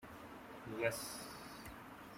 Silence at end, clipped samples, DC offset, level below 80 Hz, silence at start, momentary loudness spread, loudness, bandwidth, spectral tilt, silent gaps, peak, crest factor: 0 s; under 0.1%; under 0.1%; -68 dBFS; 0 s; 14 LU; -45 LUFS; 16 kHz; -3.5 dB/octave; none; -22 dBFS; 24 dB